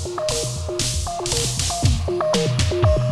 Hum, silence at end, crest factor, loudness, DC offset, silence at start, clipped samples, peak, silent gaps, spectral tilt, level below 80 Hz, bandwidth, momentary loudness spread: none; 0 s; 16 dB; -21 LUFS; under 0.1%; 0 s; under 0.1%; -6 dBFS; none; -4 dB/octave; -30 dBFS; 14.5 kHz; 5 LU